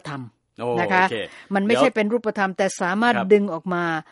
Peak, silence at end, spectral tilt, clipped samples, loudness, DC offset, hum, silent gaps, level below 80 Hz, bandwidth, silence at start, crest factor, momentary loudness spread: -4 dBFS; 0.1 s; -5 dB/octave; under 0.1%; -21 LUFS; under 0.1%; none; none; -68 dBFS; 11.5 kHz; 0.05 s; 18 dB; 10 LU